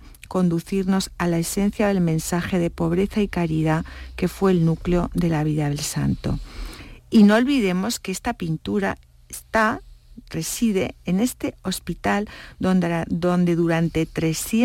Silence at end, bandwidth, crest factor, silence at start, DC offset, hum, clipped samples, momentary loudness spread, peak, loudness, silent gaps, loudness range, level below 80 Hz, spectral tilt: 0 s; 16.5 kHz; 14 dB; 0 s; under 0.1%; none; under 0.1%; 9 LU; -6 dBFS; -22 LUFS; none; 4 LU; -40 dBFS; -6 dB/octave